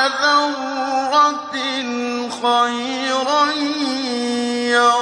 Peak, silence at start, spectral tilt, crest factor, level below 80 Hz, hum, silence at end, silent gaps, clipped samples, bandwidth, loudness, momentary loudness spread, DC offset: -2 dBFS; 0 s; -1.5 dB/octave; 16 dB; -70 dBFS; none; 0 s; none; under 0.1%; 10.5 kHz; -18 LUFS; 7 LU; under 0.1%